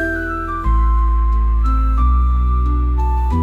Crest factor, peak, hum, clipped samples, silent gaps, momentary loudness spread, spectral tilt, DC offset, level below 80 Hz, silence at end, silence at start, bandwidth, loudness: 8 dB; -6 dBFS; none; under 0.1%; none; 4 LU; -9 dB/octave; under 0.1%; -14 dBFS; 0 s; 0 s; 3.8 kHz; -18 LUFS